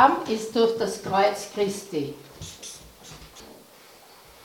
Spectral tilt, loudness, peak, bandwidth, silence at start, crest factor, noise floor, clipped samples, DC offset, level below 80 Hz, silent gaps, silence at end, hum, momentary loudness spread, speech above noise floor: -4 dB/octave; -25 LUFS; -4 dBFS; 18.5 kHz; 0 s; 24 dB; -51 dBFS; under 0.1%; under 0.1%; -58 dBFS; none; 0.9 s; none; 22 LU; 26 dB